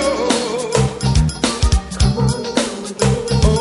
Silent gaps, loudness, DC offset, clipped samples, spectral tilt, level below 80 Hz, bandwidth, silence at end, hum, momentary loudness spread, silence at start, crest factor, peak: none; -17 LUFS; under 0.1%; under 0.1%; -5 dB/octave; -22 dBFS; 11.5 kHz; 0 s; none; 3 LU; 0 s; 16 dB; 0 dBFS